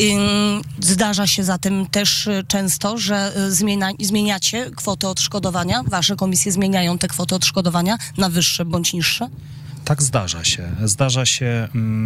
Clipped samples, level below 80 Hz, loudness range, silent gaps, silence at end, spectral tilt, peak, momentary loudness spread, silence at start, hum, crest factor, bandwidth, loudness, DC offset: under 0.1%; -46 dBFS; 1 LU; none; 0 s; -3.5 dB/octave; -8 dBFS; 5 LU; 0 s; none; 12 dB; 16 kHz; -18 LUFS; under 0.1%